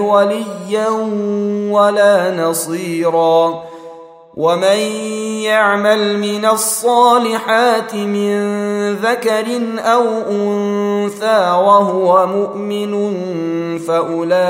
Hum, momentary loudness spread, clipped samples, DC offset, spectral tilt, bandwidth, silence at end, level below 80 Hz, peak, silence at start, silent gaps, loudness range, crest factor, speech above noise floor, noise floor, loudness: none; 9 LU; under 0.1%; under 0.1%; -4 dB/octave; 16 kHz; 0 s; -66 dBFS; 0 dBFS; 0 s; none; 3 LU; 14 dB; 22 dB; -36 dBFS; -14 LUFS